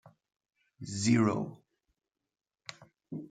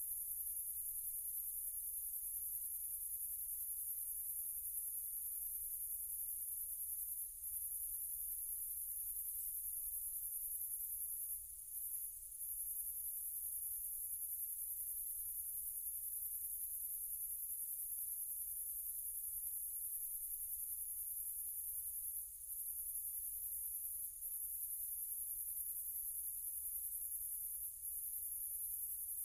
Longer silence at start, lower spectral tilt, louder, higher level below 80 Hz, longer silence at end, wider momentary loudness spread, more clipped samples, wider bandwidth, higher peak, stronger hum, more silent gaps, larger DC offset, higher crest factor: about the same, 0.05 s vs 0 s; first, -5.5 dB/octave vs 1 dB/octave; first, -30 LUFS vs -42 LUFS; about the same, -74 dBFS vs -70 dBFS; about the same, 0.05 s vs 0 s; first, 22 LU vs 1 LU; neither; second, 9.4 kHz vs over 20 kHz; first, -14 dBFS vs -28 dBFS; neither; neither; neither; first, 22 dB vs 16 dB